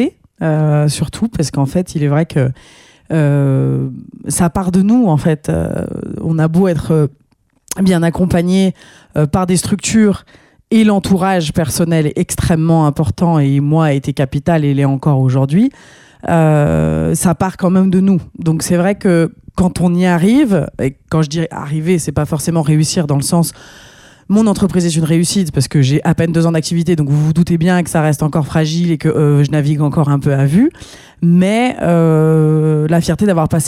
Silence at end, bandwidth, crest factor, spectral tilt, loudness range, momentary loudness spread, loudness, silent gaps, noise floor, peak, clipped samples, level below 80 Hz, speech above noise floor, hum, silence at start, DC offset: 0 s; 15 kHz; 10 dB; -6.5 dB/octave; 2 LU; 6 LU; -13 LUFS; none; -52 dBFS; -2 dBFS; under 0.1%; -38 dBFS; 39 dB; none; 0 s; under 0.1%